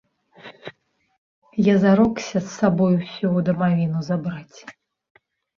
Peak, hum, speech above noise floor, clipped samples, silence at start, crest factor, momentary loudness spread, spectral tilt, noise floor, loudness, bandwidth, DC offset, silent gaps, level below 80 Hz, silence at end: -4 dBFS; none; 35 dB; under 0.1%; 0.45 s; 18 dB; 23 LU; -7.5 dB/octave; -54 dBFS; -20 LUFS; 7.2 kHz; under 0.1%; 1.18-1.42 s; -56 dBFS; 0.85 s